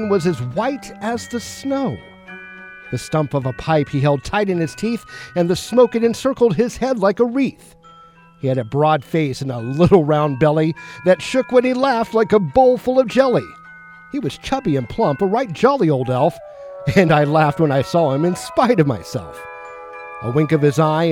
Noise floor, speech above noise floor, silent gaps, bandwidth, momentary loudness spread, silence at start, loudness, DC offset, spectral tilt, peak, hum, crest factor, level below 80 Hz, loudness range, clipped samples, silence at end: -46 dBFS; 29 dB; none; 16 kHz; 14 LU; 0 s; -18 LUFS; under 0.1%; -6.5 dB/octave; 0 dBFS; none; 16 dB; -46 dBFS; 5 LU; under 0.1%; 0 s